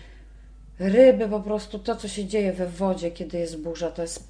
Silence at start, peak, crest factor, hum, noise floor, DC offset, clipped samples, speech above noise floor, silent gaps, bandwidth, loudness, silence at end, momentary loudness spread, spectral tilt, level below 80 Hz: 0 s; -4 dBFS; 20 dB; none; -46 dBFS; under 0.1%; under 0.1%; 22 dB; none; 10.5 kHz; -24 LUFS; 0 s; 14 LU; -6 dB/octave; -46 dBFS